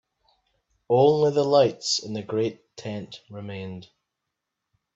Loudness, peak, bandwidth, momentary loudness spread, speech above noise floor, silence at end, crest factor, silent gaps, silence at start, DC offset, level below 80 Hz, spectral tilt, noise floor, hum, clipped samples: -23 LUFS; -6 dBFS; 8 kHz; 19 LU; 60 dB; 1.1 s; 20 dB; none; 0.9 s; under 0.1%; -68 dBFS; -5 dB/octave; -83 dBFS; none; under 0.1%